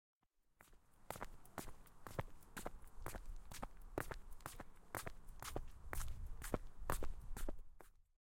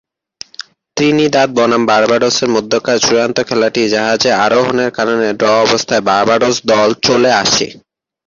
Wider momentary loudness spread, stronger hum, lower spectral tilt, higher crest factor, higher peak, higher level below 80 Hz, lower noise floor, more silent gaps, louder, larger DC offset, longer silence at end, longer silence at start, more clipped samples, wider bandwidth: first, 12 LU vs 4 LU; neither; about the same, -4.5 dB/octave vs -3.5 dB/octave; first, 26 dB vs 12 dB; second, -22 dBFS vs 0 dBFS; about the same, -52 dBFS vs -50 dBFS; first, -72 dBFS vs -36 dBFS; neither; second, -52 LUFS vs -12 LUFS; neither; second, 0.25 s vs 0.5 s; second, 0.6 s vs 0.95 s; neither; first, 16.5 kHz vs 7.6 kHz